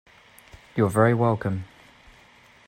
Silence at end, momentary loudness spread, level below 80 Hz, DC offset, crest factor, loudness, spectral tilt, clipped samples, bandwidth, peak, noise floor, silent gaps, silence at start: 1 s; 14 LU; -58 dBFS; under 0.1%; 18 dB; -23 LUFS; -8 dB/octave; under 0.1%; 16 kHz; -8 dBFS; -54 dBFS; none; 0.75 s